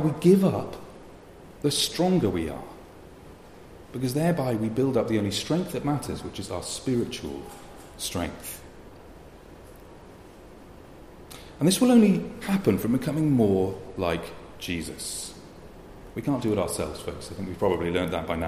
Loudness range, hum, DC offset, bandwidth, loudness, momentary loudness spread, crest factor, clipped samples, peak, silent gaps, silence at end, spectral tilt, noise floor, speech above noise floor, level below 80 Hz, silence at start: 13 LU; none; under 0.1%; 15.5 kHz; -26 LUFS; 23 LU; 20 dB; under 0.1%; -8 dBFS; none; 0 s; -5.5 dB/octave; -47 dBFS; 22 dB; -50 dBFS; 0 s